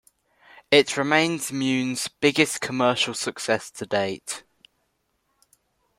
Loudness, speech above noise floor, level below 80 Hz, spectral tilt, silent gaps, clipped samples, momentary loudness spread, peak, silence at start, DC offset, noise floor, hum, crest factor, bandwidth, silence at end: -23 LUFS; 49 dB; -66 dBFS; -3.5 dB/octave; none; under 0.1%; 9 LU; -2 dBFS; 0.7 s; under 0.1%; -72 dBFS; none; 24 dB; 16.5 kHz; 1.6 s